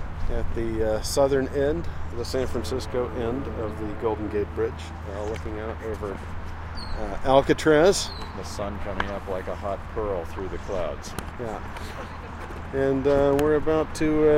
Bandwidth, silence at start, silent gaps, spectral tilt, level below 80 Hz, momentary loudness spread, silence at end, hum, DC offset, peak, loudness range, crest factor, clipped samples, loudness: 16 kHz; 0 s; none; -5.5 dB/octave; -36 dBFS; 15 LU; 0 s; none; under 0.1%; -4 dBFS; 7 LU; 22 dB; under 0.1%; -26 LUFS